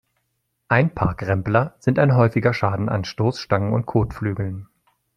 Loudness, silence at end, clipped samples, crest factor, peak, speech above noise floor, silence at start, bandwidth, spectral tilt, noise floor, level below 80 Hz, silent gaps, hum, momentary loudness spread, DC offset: -21 LUFS; 0.5 s; under 0.1%; 20 dB; -2 dBFS; 53 dB; 0.7 s; 7.2 kHz; -8 dB/octave; -73 dBFS; -44 dBFS; none; none; 8 LU; under 0.1%